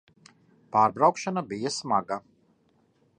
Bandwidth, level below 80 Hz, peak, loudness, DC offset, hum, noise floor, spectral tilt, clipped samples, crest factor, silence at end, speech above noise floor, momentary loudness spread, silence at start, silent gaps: 10.5 kHz; -72 dBFS; -8 dBFS; -26 LUFS; under 0.1%; none; -66 dBFS; -4.5 dB/octave; under 0.1%; 22 dB; 1 s; 41 dB; 11 LU; 0.75 s; none